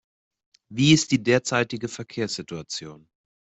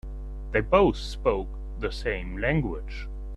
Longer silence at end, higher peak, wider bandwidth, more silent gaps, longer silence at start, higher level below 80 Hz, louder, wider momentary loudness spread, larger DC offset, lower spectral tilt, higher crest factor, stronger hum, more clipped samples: first, 0.5 s vs 0 s; about the same, -4 dBFS vs -6 dBFS; second, 8.4 kHz vs 11 kHz; neither; first, 0.7 s vs 0.05 s; second, -60 dBFS vs -34 dBFS; first, -23 LUFS vs -27 LUFS; about the same, 15 LU vs 16 LU; neither; second, -4.5 dB/octave vs -7 dB/octave; about the same, 20 dB vs 20 dB; neither; neither